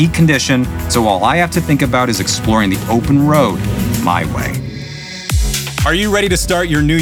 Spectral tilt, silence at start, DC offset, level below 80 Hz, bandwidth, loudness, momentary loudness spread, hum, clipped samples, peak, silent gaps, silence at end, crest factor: -5 dB/octave; 0 s; under 0.1%; -26 dBFS; over 20 kHz; -14 LUFS; 8 LU; none; under 0.1%; 0 dBFS; none; 0 s; 14 dB